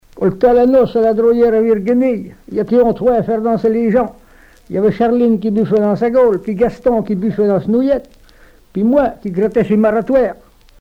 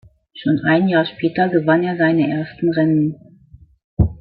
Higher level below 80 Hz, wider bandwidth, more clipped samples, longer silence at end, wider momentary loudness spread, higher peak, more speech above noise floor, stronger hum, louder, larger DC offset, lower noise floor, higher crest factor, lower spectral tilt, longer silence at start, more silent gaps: second, -42 dBFS vs -36 dBFS; first, 6.4 kHz vs 4.8 kHz; neither; first, 0.45 s vs 0.05 s; about the same, 7 LU vs 6 LU; about the same, -2 dBFS vs -2 dBFS; about the same, 31 dB vs 30 dB; neither; first, -14 LUFS vs -17 LUFS; neither; about the same, -44 dBFS vs -47 dBFS; about the same, 12 dB vs 16 dB; second, -9 dB/octave vs -11.5 dB/octave; second, 0.15 s vs 0.35 s; second, none vs 3.84-3.97 s